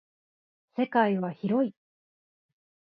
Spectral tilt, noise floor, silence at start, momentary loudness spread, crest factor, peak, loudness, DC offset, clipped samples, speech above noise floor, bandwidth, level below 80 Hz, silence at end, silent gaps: -10 dB/octave; under -90 dBFS; 0.75 s; 7 LU; 22 dB; -10 dBFS; -28 LUFS; under 0.1%; under 0.1%; over 64 dB; 5.2 kHz; -80 dBFS; 1.25 s; none